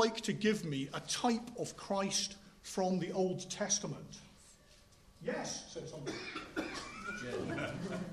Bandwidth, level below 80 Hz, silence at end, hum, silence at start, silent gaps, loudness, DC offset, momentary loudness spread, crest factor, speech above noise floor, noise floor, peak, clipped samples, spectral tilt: 13.5 kHz; -66 dBFS; 0 s; none; 0 s; none; -38 LUFS; under 0.1%; 10 LU; 22 dB; 25 dB; -63 dBFS; -18 dBFS; under 0.1%; -3.5 dB/octave